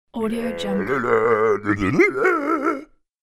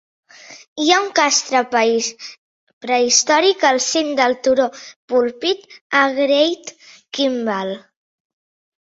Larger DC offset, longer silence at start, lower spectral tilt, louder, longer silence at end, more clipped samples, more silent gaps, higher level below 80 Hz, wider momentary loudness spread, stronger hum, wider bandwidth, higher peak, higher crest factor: neither; second, 0.15 s vs 0.5 s; first, -6.5 dB/octave vs -1 dB/octave; second, -20 LUFS vs -17 LUFS; second, 0.4 s vs 1.05 s; neither; second, none vs 0.67-0.76 s, 2.38-2.67 s, 2.73-2.81 s, 4.96-5.08 s, 5.81-5.90 s; first, -48 dBFS vs -66 dBFS; second, 8 LU vs 16 LU; neither; first, 13.5 kHz vs 8 kHz; second, -4 dBFS vs 0 dBFS; about the same, 16 dB vs 18 dB